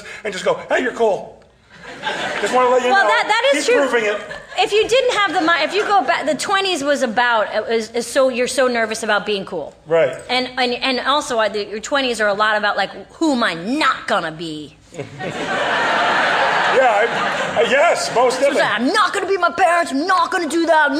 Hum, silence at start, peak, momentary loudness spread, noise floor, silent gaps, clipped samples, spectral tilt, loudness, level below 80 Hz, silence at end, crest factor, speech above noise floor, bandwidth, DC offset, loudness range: none; 0 s; -4 dBFS; 10 LU; -44 dBFS; none; under 0.1%; -2.5 dB/octave; -17 LUFS; -56 dBFS; 0 s; 14 dB; 27 dB; 14.5 kHz; under 0.1%; 3 LU